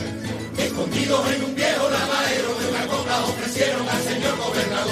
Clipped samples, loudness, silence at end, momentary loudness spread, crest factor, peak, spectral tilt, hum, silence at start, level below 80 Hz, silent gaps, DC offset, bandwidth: under 0.1%; -22 LUFS; 0 s; 4 LU; 16 dB; -8 dBFS; -3.5 dB/octave; none; 0 s; -54 dBFS; none; under 0.1%; 15.5 kHz